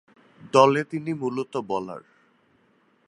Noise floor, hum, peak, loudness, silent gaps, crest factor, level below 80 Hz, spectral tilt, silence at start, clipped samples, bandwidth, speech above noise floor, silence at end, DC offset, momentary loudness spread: -64 dBFS; none; -2 dBFS; -23 LUFS; none; 22 dB; -70 dBFS; -5.5 dB/octave; 0.45 s; under 0.1%; 11 kHz; 41 dB; 1.1 s; under 0.1%; 15 LU